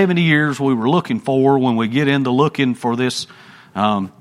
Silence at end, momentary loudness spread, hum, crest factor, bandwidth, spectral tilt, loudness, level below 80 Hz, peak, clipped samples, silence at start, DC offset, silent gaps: 0.1 s; 6 LU; none; 16 dB; 12.5 kHz; -6 dB/octave; -17 LUFS; -60 dBFS; 0 dBFS; under 0.1%; 0 s; under 0.1%; none